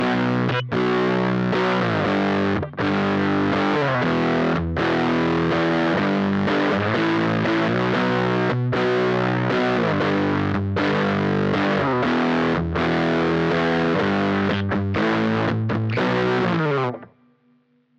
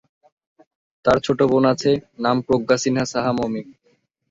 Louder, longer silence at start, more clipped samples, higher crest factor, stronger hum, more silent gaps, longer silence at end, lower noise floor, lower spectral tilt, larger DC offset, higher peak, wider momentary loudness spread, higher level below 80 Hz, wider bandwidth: about the same, -21 LUFS vs -20 LUFS; second, 0 s vs 1.05 s; neither; second, 12 dB vs 18 dB; neither; neither; first, 0.95 s vs 0.6 s; about the same, -61 dBFS vs -64 dBFS; first, -7.5 dB/octave vs -5.5 dB/octave; neither; second, -10 dBFS vs -2 dBFS; second, 2 LU vs 7 LU; about the same, -48 dBFS vs -52 dBFS; about the same, 8.2 kHz vs 7.8 kHz